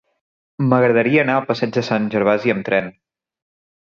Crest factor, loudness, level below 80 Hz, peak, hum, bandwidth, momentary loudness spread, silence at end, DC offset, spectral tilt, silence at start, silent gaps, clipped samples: 18 dB; -17 LUFS; -60 dBFS; -2 dBFS; none; 7.4 kHz; 6 LU; 0.95 s; under 0.1%; -7.5 dB/octave; 0.6 s; none; under 0.1%